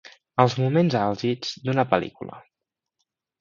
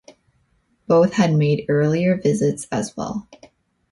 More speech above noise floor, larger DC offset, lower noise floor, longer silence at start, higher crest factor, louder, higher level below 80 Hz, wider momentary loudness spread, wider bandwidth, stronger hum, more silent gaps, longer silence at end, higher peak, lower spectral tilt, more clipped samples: first, 62 dB vs 45 dB; neither; first, -84 dBFS vs -64 dBFS; second, 0.35 s vs 0.9 s; first, 24 dB vs 16 dB; second, -23 LUFS vs -19 LUFS; second, -62 dBFS vs -56 dBFS; about the same, 13 LU vs 11 LU; second, 7.4 kHz vs 11.5 kHz; neither; neither; first, 1 s vs 0.55 s; about the same, -2 dBFS vs -4 dBFS; about the same, -7 dB/octave vs -7 dB/octave; neither